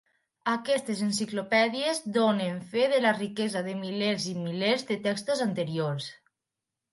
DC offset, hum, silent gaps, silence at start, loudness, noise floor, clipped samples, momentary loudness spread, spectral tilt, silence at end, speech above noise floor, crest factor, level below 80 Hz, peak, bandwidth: under 0.1%; none; none; 0.45 s; -28 LUFS; -88 dBFS; under 0.1%; 7 LU; -4.5 dB/octave; 0.75 s; 60 dB; 20 dB; -76 dBFS; -10 dBFS; 11.5 kHz